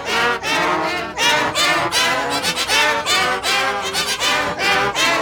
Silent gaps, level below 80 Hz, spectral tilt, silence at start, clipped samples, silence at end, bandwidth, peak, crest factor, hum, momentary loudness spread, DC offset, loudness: none; -48 dBFS; -1 dB/octave; 0 s; under 0.1%; 0 s; over 20 kHz; -2 dBFS; 16 dB; none; 4 LU; under 0.1%; -16 LUFS